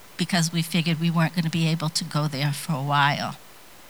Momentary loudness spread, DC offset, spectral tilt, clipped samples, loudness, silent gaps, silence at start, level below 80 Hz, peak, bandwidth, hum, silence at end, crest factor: 6 LU; 0.3%; -4.5 dB/octave; under 0.1%; -24 LUFS; none; 0.2 s; -66 dBFS; -6 dBFS; over 20 kHz; none; 0 s; 18 dB